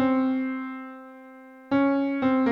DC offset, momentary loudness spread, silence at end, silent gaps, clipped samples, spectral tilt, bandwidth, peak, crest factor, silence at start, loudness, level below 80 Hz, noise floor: under 0.1%; 22 LU; 0 s; none; under 0.1%; -8 dB/octave; 5.2 kHz; -12 dBFS; 14 dB; 0 s; -25 LUFS; -64 dBFS; -47 dBFS